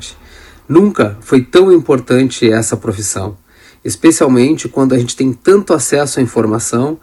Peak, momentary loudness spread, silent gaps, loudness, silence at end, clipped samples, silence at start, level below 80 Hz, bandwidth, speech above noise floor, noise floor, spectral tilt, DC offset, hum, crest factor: 0 dBFS; 9 LU; none; -12 LUFS; 0.05 s; 0.3%; 0 s; -46 dBFS; 12.5 kHz; 27 dB; -38 dBFS; -5 dB/octave; under 0.1%; none; 12 dB